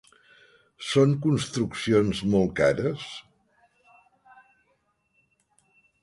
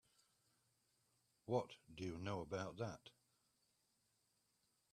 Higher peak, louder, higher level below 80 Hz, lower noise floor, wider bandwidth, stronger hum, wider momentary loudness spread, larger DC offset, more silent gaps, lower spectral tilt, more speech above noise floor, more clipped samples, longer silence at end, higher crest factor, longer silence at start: first, -8 dBFS vs -26 dBFS; first, -24 LUFS vs -47 LUFS; first, -54 dBFS vs -78 dBFS; second, -71 dBFS vs -84 dBFS; second, 11.5 kHz vs 13.5 kHz; neither; about the same, 15 LU vs 16 LU; neither; neither; about the same, -6 dB/octave vs -6 dB/octave; first, 47 dB vs 37 dB; neither; first, 2.85 s vs 1.8 s; about the same, 20 dB vs 24 dB; second, 0.8 s vs 1.45 s